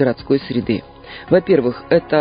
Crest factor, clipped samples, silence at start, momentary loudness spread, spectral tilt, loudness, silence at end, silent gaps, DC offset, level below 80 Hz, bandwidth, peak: 16 dB; under 0.1%; 0 s; 12 LU; -12 dB/octave; -17 LUFS; 0 s; none; under 0.1%; -46 dBFS; 5.2 kHz; 0 dBFS